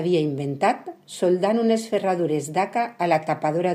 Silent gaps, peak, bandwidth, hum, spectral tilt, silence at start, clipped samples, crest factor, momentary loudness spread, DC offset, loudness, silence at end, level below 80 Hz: none; -8 dBFS; 15 kHz; none; -6 dB/octave; 0 s; under 0.1%; 14 dB; 5 LU; under 0.1%; -23 LUFS; 0 s; -72 dBFS